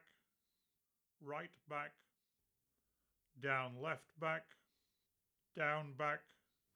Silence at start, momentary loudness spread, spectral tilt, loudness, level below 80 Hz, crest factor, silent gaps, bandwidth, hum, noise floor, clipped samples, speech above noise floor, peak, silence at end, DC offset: 1.2 s; 10 LU; -6 dB/octave; -44 LUFS; under -90 dBFS; 24 dB; none; 19.5 kHz; none; -88 dBFS; under 0.1%; 44 dB; -24 dBFS; 0.55 s; under 0.1%